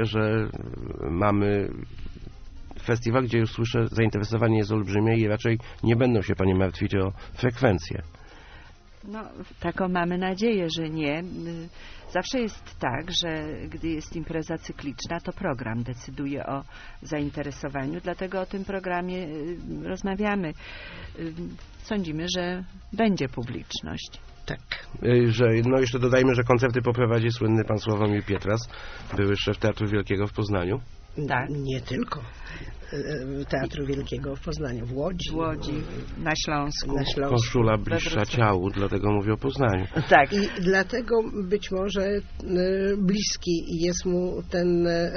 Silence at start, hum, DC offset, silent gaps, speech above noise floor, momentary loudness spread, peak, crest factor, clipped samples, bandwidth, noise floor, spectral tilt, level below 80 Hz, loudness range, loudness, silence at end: 0 s; none; under 0.1%; none; 21 dB; 14 LU; -2 dBFS; 24 dB; under 0.1%; 6.6 kHz; -47 dBFS; -5.5 dB/octave; -42 dBFS; 8 LU; -26 LUFS; 0 s